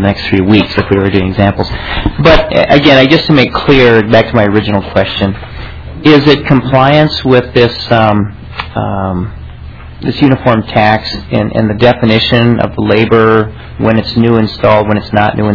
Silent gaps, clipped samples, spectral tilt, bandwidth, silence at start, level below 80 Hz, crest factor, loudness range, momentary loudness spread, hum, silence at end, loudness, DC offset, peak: none; 4%; -7.5 dB/octave; 5.4 kHz; 0 s; -26 dBFS; 8 dB; 5 LU; 12 LU; none; 0 s; -9 LUFS; under 0.1%; 0 dBFS